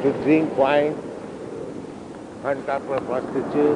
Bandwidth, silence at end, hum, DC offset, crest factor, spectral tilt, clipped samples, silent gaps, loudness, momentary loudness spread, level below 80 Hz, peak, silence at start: 10 kHz; 0 s; none; under 0.1%; 18 dB; -7 dB/octave; under 0.1%; none; -23 LUFS; 16 LU; -58 dBFS; -6 dBFS; 0 s